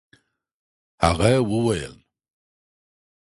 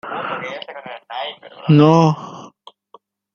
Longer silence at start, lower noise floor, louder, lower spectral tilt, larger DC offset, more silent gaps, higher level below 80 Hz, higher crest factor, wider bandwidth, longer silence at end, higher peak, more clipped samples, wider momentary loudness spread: first, 1 s vs 0.05 s; first, -61 dBFS vs -51 dBFS; second, -21 LUFS vs -17 LUFS; second, -6 dB/octave vs -7.5 dB/octave; neither; neither; first, -40 dBFS vs -60 dBFS; about the same, 22 dB vs 18 dB; first, 11.5 kHz vs 6.8 kHz; first, 1.4 s vs 0.85 s; about the same, -4 dBFS vs -2 dBFS; neither; second, 10 LU vs 22 LU